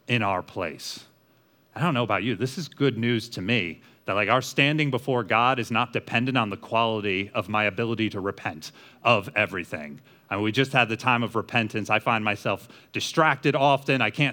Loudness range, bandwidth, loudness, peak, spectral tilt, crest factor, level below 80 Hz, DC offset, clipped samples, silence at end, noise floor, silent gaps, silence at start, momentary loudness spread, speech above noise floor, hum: 4 LU; over 20 kHz; -24 LUFS; -4 dBFS; -5 dB/octave; 22 dB; -70 dBFS; under 0.1%; under 0.1%; 0 s; -62 dBFS; none; 0.1 s; 12 LU; 36 dB; none